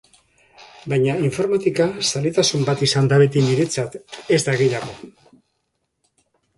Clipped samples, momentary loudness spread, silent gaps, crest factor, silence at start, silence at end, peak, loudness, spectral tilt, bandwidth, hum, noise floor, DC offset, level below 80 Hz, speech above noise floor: under 0.1%; 13 LU; none; 18 dB; 0.6 s; 1.5 s; -2 dBFS; -19 LUFS; -5 dB/octave; 11.5 kHz; none; -73 dBFS; under 0.1%; -58 dBFS; 54 dB